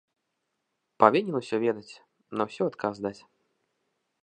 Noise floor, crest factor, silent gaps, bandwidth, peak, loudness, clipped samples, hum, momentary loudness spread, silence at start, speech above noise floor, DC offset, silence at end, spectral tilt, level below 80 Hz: -80 dBFS; 28 dB; none; 9.4 kHz; -2 dBFS; -27 LUFS; under 0.1%; none; 15 LU; 1 s; 54 dB; under 0.1%; 1.1 s; -6.5 dB/octave; -74 dBFS